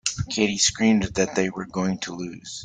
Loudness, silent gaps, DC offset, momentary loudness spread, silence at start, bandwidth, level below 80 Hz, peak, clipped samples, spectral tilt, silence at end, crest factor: -23 LUFS; none; under 0.1%; 12 LU; 0.05 s; 9.6 kHz; -50 dBFS; -6 dBFS; under 0.1%; -3.5 dB/octave; 0 s; 18 dB